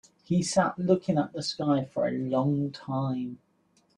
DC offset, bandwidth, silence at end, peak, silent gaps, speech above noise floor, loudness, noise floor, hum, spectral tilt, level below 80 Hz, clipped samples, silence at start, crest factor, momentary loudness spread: under 0.1%; 11 kHz; 0.6 s; -10 dBFS; none; 40 dB; -28 LUFS; -67 dBFS; none; -6 dB/octave; -66 dBFS; under 0.1%; 0.3 s; 20 dB; 7 LU